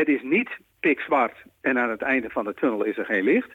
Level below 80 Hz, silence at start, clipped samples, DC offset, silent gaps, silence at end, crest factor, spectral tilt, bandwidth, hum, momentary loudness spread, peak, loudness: -66 dBFS; 0 s; under 0.1%; under 0.1%; none; 0 s; 12 dB; -7 dB/octave; 6.4 kHz; none; 6 LU; -12 dBFS; -24 LUFS